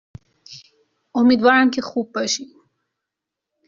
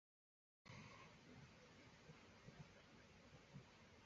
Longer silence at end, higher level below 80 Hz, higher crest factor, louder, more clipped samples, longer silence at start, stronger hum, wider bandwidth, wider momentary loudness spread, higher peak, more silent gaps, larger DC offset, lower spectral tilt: first, 1.2 s vs 0 s; first, -62 dBFS vs -80 dBFS; about the same, 18 dB vs 18 dB; first, -18 LUFS vs -64 LUFS; neither; second, 0.5 s vs 0.65 s; neither; about the same, 7.4 kHz vs 7.4 kHz; first, 11 LU vs 5 LU; first, -2 dBFS vs -48 dBFS; neither; neither; second, -2 dB/octave vs -4 dB/octave